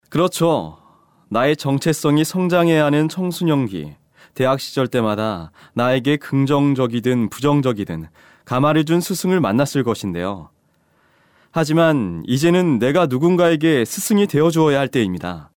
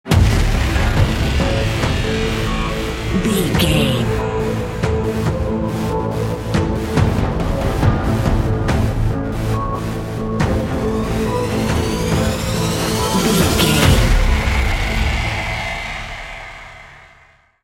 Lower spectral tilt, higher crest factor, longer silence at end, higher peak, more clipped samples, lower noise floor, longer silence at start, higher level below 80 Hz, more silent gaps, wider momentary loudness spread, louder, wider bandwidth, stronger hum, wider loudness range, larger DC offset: about the same, -6 dB/octave vs -5.5 dB/octave; about the same, 12 dB vs 16 dB; second, 0.15 s vs 0.6 s; second, -6 dBFS vs 0 dBFS; neither; first, -61 dBFS vs -50 dBFS; about the same, 0.1 s vs 0.05 s; second, -54 dBFS vs -22 dBFS; neither; about the same, 10 LU vs 8 LU; about the same, -18 LUFS vs -18 LUFS; first, 19 kHz vs 17 kHz; neither; about the same, 4 LU vs 4 LU; neither